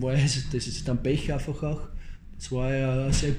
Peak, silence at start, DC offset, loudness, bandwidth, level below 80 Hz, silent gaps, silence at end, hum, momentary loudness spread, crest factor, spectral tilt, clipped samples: -12 dBFS; 0 s; under 0.1%; -28 LUFS; 11 kHz; -34 dBFS; none; 0 s; none; 17 LU; 16 dB; -5.5 dB/octave; under 0.1%